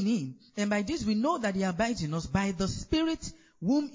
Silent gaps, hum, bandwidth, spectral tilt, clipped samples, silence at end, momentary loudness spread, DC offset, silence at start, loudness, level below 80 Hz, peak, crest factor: none; none; 7.6 kHz; -5.5 dB/octave; under 0.1%; 0 s; 6 LU; under 0.1%; 0 s; -30 LUFS; -50 dBFS; -14 dBFS; 16 dB